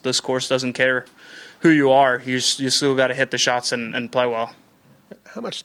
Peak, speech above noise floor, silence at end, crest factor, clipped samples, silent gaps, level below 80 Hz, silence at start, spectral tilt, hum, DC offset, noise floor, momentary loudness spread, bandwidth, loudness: -4 dBFS; 34 dB; 0.05 s; 18 dB; under 0.1%; none; -68 dBFS; 0.05 s; -3 dB/octave; none; under 0.1%; -54 dBFS; 11 LU; 15.5 kHz; -19 LUFS